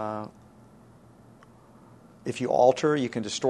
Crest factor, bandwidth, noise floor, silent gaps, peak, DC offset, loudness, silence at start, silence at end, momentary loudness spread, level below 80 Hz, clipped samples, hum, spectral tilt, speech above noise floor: 22 dB; 11.5 kHz; -53 dBFS; none; -6 dBFS; under 0.1%; -26 LUFS; 0 s; 0 s; 17 LU; -66 dBFS; under 0.1%; none; -5 dB/octave; 28 dB